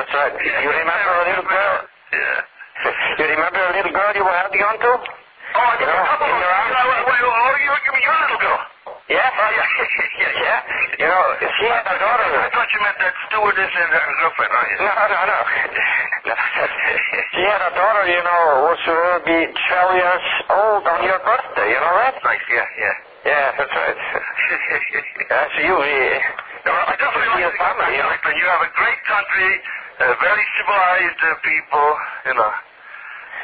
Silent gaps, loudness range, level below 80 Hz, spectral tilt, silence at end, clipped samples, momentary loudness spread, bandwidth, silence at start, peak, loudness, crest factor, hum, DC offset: none; 2 LU; -54 dBFS; -6 dB/octave; 0 s; under 0.1%; 5 LU; 5 kHz; 0 s; -4 dBFS; -17 LUFS; 14 dB; none; under 0.1%